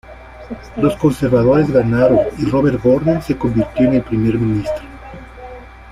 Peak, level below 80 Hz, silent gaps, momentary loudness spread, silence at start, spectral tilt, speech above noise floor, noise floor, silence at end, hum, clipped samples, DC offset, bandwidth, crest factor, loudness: -2 dBFS; -36 dBFS; none; 22 LU; 0.1 s; -8.5 dB/octave; 20 dB; -34 dBFS; 0 s; none; under 0.1%; under 0.1%; 14 kHz; 14 dB; -15 LUFS